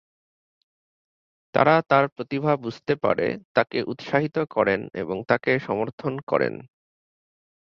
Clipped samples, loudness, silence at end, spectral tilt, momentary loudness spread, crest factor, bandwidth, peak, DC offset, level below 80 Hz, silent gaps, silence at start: under 0.1%; -24 LUFS; 1.1 s; -8 dB/octave; 10 LU; 22 dB; 7 kHz; -2 dBFS; under 0.1%; -62 dBFS; 2.12-2.16 s, 3.45-3.55 s, 5.93-5.98 s, 6.23-6.27 s; 1.55 s